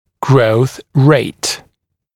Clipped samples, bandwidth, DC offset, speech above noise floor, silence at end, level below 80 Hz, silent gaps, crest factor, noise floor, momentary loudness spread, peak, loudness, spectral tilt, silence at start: under 0.1%; 15.5 kHz; under 0.1%; 49 dB; 0.6 s; -52 dBFS; none; 14 dB; -61 dBFS; 9 LU; 0 dBFS; -13 LUFS; -6 dB/octave; 0.2 s